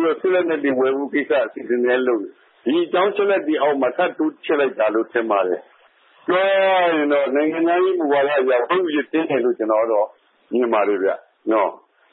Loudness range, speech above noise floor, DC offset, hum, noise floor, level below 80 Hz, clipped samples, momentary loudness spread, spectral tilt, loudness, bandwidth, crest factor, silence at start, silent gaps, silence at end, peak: 2 LU; 35 dB; under 0.1%; none; -54 dBFS; -82 dBFS; under 0.1%; 6 LU; -9.5 dB/octave; -19 LUFS; 4.1 kHz; 14 dB; 0 s; none; 0.35 s; -6 dBFS